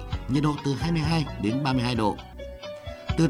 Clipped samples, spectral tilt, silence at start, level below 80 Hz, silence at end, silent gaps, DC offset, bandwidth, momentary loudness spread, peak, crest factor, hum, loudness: under 0.1%; -6.5 dB/octave; 0 s; -40 dBFS; 0 s; none; under 0.1%; 12 kHz; 14 LU; -10 dBFS; 16 dB; none; -26 LUFS